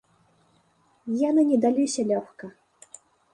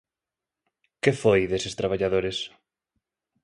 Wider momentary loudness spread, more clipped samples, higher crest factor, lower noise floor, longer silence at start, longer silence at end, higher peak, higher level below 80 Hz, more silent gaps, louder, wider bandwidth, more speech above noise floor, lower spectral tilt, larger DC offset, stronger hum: first, 22 LU vs 10 LU; neither; second, 16 dB vs 24 dB; second, -64 dBFS vs -89 dBFS; about the same, 1.05 s vs 1.05 s; about the same, 0.85 s vs 0.95 s; second, -10 dBFS vs -4 dBFS; second, -74 dBFS vs -52 dBFS; neither; about the same, -23 LUFS vs -25 LUFS; about the same, 11.5 kHz vs 11.5 kHz; second, 41 dB vs 65 dB; about the same, -5 dB/octave vs -5 dB/octave; neither; neither